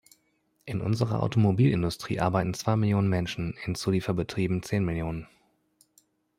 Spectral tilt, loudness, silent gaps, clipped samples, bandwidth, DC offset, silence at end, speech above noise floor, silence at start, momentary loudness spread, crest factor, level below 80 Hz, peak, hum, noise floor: -7 dB/octave; -27 LUFS; none; under 0.1%; 15.5 kHz; under 0.1%; 1.15 s; 45 dB; 0.65 s; 9 LU; 18 dB; -52 dBFS; -10 dBFS; none; -71 dBFS